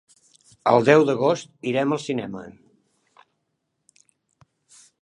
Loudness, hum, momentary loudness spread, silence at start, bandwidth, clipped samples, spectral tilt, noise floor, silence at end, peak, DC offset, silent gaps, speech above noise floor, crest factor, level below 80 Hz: -21 LUFS; none; 14 LU; 0.65 s; 10.5 kHz; under 0.1%; -6 dB/octave; -76 dBFS; 2.55 s; -2 dBFS; under 0.1%; none; 56 dB; 22 dB; -68 dBFS